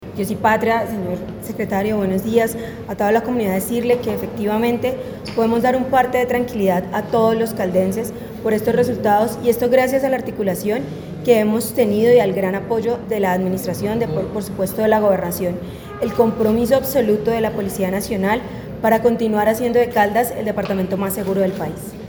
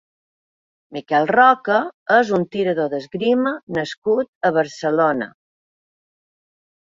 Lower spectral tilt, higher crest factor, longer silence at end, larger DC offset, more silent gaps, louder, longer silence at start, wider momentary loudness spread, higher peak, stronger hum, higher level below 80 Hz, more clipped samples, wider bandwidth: about the same, -6 dB/octave vs -6 dB/octave; about the same, 16 dB vs 18 dB; second, 0 s vs 1.6 s; neither; second, none vs 1.94-2.06 s, 3.63-3.67 s, 3.97-4.02 s, 4.28-4.41 s; about the same, -19 LUFS vs -19 LUFS; second, 0 s vs 0.9 s; about the same, 9 LU vs 11 LU; about the same, -2 dBFS vs -2 dBFS; neither; first, -46 dBFS vs -64 dBFS; neither; first, over 20 kHz vs 7.6 kHz